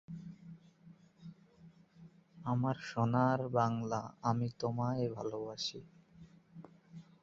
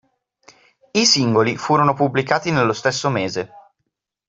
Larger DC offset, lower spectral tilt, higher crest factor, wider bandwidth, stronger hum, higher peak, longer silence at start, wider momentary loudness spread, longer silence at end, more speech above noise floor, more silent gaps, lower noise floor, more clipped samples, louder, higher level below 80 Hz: neither; first, -6 dB/octave vs -4 dB/octave; about the same, 22 dB vs 20 dB; about the same, 7.6 kHz vs 8 kHz; neither; second, -16 dBFS vs 0 dBFS; second, 0.1 s vs 0.95 s; first, 24 LU vs 9 LU; second, 0.2 s vs 0.7 s; second, 26 dB vs 58 dB; neither; second, -61 dBFS vs -76 dBFS; neither; second, -36 LUFS vs -18 LUFS; second, -70 dBFS vs -58 dBFS